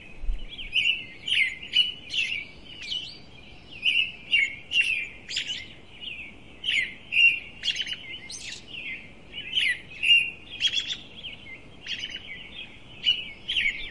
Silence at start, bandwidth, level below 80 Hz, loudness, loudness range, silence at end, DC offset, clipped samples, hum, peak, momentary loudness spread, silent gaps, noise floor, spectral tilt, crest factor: 0 s; 11.5 kHz; -46 dBFS; -25 LUFS; 2 LU; 0 s; 0.3%; under 0.1%; none; -10 dBFS; 20 LU; none; -48 dBFS; 0 dB/octave; 20 dB